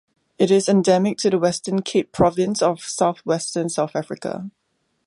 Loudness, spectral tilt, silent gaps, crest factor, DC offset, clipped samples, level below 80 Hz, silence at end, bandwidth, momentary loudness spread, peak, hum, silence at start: -20 LUFS; -5 dB/octave; none; 18 dB; under 0.1%; under 0.1%; -54 dBFS; 0.6 s; 11.5 kHz; 12 LU; -4 dBFS; none; 0.4 s